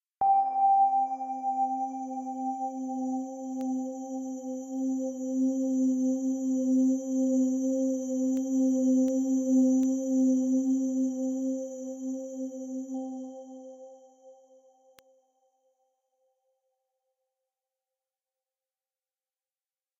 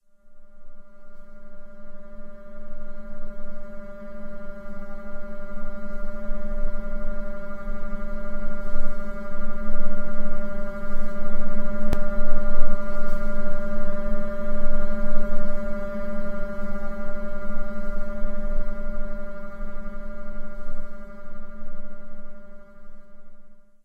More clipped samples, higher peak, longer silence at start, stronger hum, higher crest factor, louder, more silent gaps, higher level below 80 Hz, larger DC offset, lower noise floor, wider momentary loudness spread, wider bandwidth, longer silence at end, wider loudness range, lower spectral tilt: neither; second, -16 dBFS vs 0 dBFS; about the same, 0.2 s vs 0.3 s; neither; about the same, 14 dB vs 16 dB; first, -29 LUFS vs -34 LUFS; neither; second, -84 dBFS vs -26 dBFS; neither; first, under -90 dBFS vs -41 dBFS; second, 12 LU vs 16 LU; first, 7.8 kHz vs 2.1 kHz; first, 5.65 s vs 0.3 s; about the same, 13 LU vs 12 LU; second, -6 dB/octave vs -8.5 dB/octave